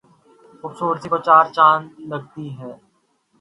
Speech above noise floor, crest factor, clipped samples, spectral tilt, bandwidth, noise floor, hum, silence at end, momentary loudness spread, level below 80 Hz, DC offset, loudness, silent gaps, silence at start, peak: 46 dB; 20 dB; under 0.1%; -6 dB/octave; 11 kHz; -64 dBFS; none; 0.65 s; 22 LU; -68 dBFS; under 0.1%; -16 LUFS; none; 0.65 s; 0 dBFS